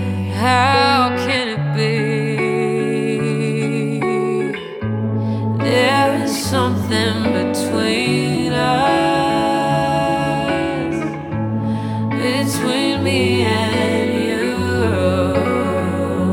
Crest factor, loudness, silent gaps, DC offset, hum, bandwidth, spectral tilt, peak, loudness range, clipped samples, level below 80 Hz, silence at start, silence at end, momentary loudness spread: 16 dB; -17 LUFS; none; under 0.1%; none; 18.5 kHz; -5.5 dB/octave; -2 dBFS; 2 LU; under 0.1%; -46 dBFS; 0 s; 0 s; 6 LU